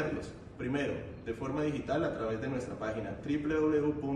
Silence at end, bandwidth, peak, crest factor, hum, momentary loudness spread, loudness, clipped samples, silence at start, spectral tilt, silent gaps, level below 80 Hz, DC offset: 0 s; 10 kHz; -20 dBFS; 14 dB; none; 11 LU; -34 LUFS; under 0.1%; 0 s; -7 dB/octave; none; -56 dBFS; under 0.1%